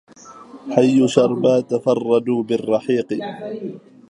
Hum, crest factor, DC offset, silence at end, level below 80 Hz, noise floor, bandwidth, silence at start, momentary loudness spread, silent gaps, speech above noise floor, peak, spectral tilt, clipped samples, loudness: none; 18 dB; under 0.1%; 0.3 s; -64 dBFS; -41 dBFS; 10.5 kHz; 0.25 s; 15 LU; none; 23 dB; 0 dBFS; -6.5 dB/octave; under 0.1%; -18 LUFS